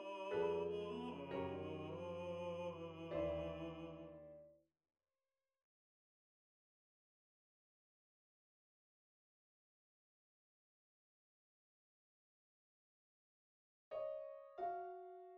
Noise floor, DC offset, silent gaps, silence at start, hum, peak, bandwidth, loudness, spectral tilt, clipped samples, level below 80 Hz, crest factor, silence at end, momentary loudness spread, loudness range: under -90 dBFS; under 0.1%; 5.63-13.91 s; 0 s; none; -30 dBFS; 9.8 kHz; -47 LUFS; -7 dB/octave; under 0.1%; -72 dBFS; 20 dB; 0 s; 13 LU; 14 LU